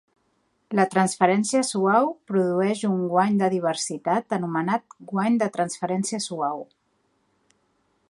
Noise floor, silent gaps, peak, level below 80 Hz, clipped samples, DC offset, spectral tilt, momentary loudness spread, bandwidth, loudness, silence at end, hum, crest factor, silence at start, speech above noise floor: -69 dBFS; none; -4 dBFS; -72 dBFS; under 0.1%; under 0.1%; -5 dB/octave; 7 LU; 11.5 kHz; -23 LUFS; 1.45 s; none; 22 dB; 0.7 s; 46 dB